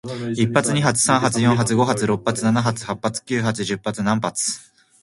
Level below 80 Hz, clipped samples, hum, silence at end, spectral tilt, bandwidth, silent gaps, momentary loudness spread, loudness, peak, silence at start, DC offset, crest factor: -54 dBFS; under 0.1%; none; 0.4 s; -4.5 dB/octave; 12 kHz; none; 8 LU; -20 LUFS; 0 dBFS; 0.05 s; under 0.1%; 20 dB